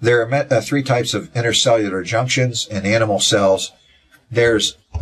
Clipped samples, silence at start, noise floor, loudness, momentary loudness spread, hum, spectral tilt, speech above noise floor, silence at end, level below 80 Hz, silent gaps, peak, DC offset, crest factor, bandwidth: under 0.1%; 0 s; -53 dBFS; -17 LUFS; 7 LU; none; -4 dB/octave; 36 dB; 0 s; -42 dBFS; none; -2 dBFS; under 0.1%; 16 dB; 14 kHz